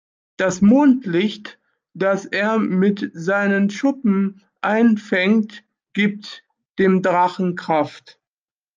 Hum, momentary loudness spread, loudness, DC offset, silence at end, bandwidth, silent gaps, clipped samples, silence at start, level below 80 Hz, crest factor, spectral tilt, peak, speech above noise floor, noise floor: none; 12 LU; -19 LUFS; under 0.1%; 0.8 s; 7.4 kHz; 6.70-6.74 s; under 0.1%; 0.4 s; -62 dBFS; 14 dB; -6.5 dB/octave; -4 dBFS; over 72 dB; under -90 dBFS